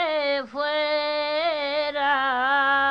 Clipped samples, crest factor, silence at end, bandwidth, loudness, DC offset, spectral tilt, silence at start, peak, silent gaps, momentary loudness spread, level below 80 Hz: under 0.1%; 14 dB; 0 s; 6.6 kHz; -23 LUFS; under 0.1%; -3.5 dB/octave; 0 s; -10 dBFS; none; 5 LU; -64 dBFS